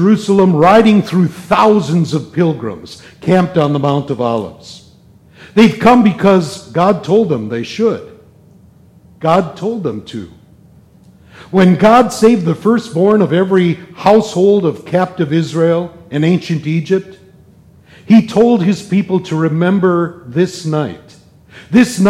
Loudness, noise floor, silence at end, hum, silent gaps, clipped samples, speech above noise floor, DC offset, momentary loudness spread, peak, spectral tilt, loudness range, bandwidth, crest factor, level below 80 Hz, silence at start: -12 LUFS; -44 dBFS; 0 s; none; none; under 0.1%; 32 dB; under 0.1%; 11 LU; 0 dBFS; -7 dB/octave; 5 LU; 13.5 kHz; 12 dB; -48 dBFS; 0 s